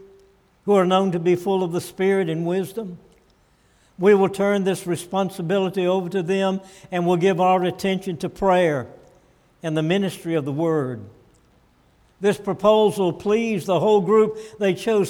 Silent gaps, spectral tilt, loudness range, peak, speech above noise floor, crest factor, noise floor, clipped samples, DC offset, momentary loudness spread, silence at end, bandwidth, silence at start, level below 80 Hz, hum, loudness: none; -6.5 dB/octave; 4 LU; -4 dBFS; 38 dB; 16 dB; -59 dBFS; under 0.1%; under 0.1%; 9 LU; 0 s; 17 kHz; 0 s; -58 dBFS; none; -21 LUFS